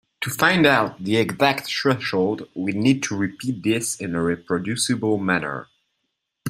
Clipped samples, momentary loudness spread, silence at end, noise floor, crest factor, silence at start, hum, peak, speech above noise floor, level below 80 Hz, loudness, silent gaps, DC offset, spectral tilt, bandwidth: under 0.1%; 9 LU; 0 s; -77 dBFS; 20 dB; 0.2 s; none; -2 dBFS; 55 dB; -58 dBFS; -21 LUFS; none; under 0.1%; -4.5 dB/octave; 16 kHz